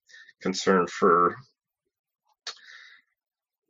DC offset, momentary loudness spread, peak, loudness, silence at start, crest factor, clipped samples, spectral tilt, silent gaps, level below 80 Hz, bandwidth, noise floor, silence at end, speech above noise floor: under 0.1%; 21 LU; -8 dBFS; -24 LUFS; 0.4 s; 22 dB; under 0.1%; -4.5 dB/octave; 1.99-2.04 s; -68 dBFS; 7.8 kHz; -53 dBFS; 0.95 s; 30 dB